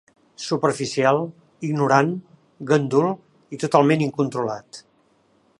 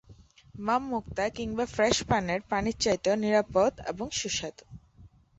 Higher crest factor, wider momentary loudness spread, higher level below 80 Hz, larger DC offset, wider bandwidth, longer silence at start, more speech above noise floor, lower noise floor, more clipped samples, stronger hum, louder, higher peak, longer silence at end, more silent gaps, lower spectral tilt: about the same, 22 dB vs 18 dB; first, 16 LU vs 8 LU; second, -68 dBFS vs -52 dBFS; neither; first, 11.5 kHz vs 8.2 kHz; first, 0.4 s vs 0.1 s; first, 41 dB vs 28 dB; first, -61 dBFS vs -56 dBFS; neither; neither; first, -21 LUFS vs -28 LUFS; first, -2 dBFS vs -10 dBFS; first, 0.8 s vs 0.3 s; neither; first, -6 dB/octave vs -4 dB/octave